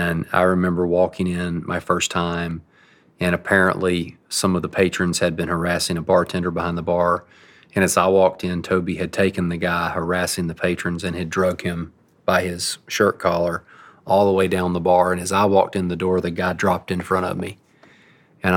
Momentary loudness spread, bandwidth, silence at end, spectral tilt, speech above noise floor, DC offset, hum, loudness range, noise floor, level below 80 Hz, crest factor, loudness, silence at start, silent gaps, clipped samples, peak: 8 LU; 17.5 kHz; 0 s; -5 dB/octave; 34 dB; under 0.1%; none; 3 LU; -54 dBFS; -54 dBFS; 18 dB; -20 LUFS; 0 s; none; under 0.1%; -2 dBFS